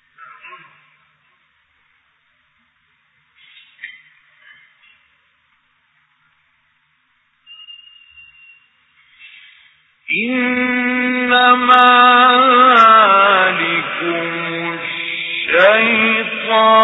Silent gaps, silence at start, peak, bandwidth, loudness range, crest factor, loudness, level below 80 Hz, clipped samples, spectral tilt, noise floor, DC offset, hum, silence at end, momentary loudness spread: none; 0.45 s; 0 dBFS; 7.2 kHz; 12 LU; 16 dB; -12 LUFS; -64 dBFS; under 0.1%; -5 dB/octave; -61 dBFS; under 0.1%; none; 0 s; 14 LU